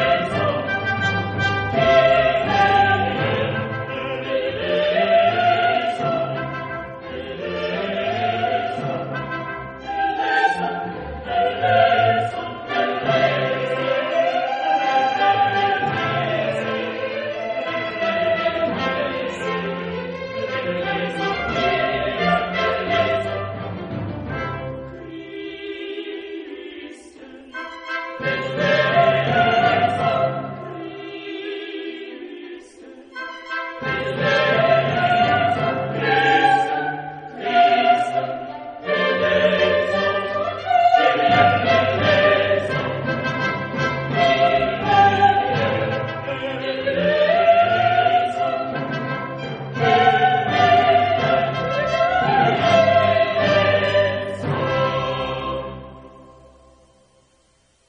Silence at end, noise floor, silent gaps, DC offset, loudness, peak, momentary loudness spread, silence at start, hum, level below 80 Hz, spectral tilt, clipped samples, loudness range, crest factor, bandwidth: 1.55 s; -60 dBFS; none; under 0.1%; -19 LUFS; -2 dBFS; 15 LU; 0 s; none; -50 dBFS; -6 dB/octave; under 0.1%; 8 LU; 18 dB; 9 kHz